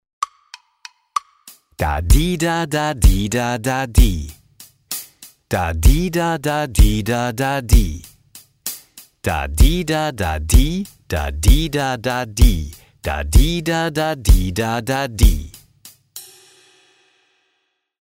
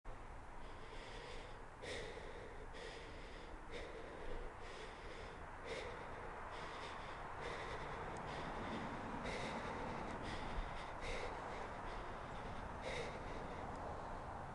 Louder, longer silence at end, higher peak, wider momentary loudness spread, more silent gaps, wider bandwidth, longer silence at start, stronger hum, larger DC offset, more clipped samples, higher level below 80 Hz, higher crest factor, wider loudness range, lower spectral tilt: first, -19 LUFS vs -49 LUFS; first, 1.8 s vs 0 s; first, 0 dBFS vs -32 dBFS; first, 12 LU vs 8 LU; neither; first, 16.5 kHz vs 11.5 kHz; first, 0.2 s vs 0.05 s; neither; neither; neither; first, -20 dBFS vs -54 dBFS; about the same, 16 dB vs 16 dB; second, 2 LU vs 6 LU; about the same, -5 dB/octave vs -5 dB/octave